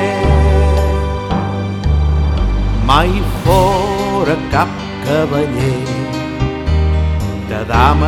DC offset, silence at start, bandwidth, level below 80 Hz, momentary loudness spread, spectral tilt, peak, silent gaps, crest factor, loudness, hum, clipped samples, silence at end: under 0.1%; 0 s; 14 kHz; -18 dBFS; 7 LU; -6.5 dB/octave; 0 dBFS; none; 14 dB; -15 LUFS; none; under 0.1%; 0 s